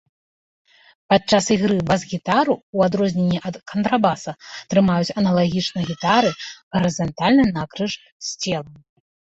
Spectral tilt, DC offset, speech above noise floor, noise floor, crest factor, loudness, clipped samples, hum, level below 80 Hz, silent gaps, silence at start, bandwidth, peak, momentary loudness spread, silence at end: -5.5 dB/octave; under 0.1%; over 70 dB; under -90 dBFS; 18 dB; -20 LUFS; under 0.1%; none; -52 dBFS; 2.63-2.73 s, 6.63-6.71 s, 8.12-8.20 s; 1.1 s; 8 kHz; -4 dBFS; 10 LU; 0.65 s